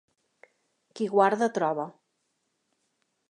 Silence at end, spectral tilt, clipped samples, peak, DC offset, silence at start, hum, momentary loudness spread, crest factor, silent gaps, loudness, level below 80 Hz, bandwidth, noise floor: 1.4 s; -5.5 dB/octave; under 0.1%; -8 dBFS; under 0.1%; 0.95 s; none; 11 LU; 22 dB; none; -26 LUFS; -86 dBFS; 11 kHz; -77 dBFS